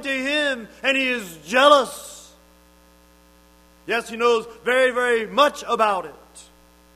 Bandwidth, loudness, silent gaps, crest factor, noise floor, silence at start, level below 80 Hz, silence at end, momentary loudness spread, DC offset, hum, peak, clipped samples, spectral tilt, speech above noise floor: 15.5 kHz; -20 LUFS; none; 22 dB; -53 dBFS; 0 s; -58 dBFS; 0.55 s; 13 LU; under 0.1%; 60 Hz at -55 dBFS; 0 dBFS; under 0.1%; -2.5 dB/octave; 33 dB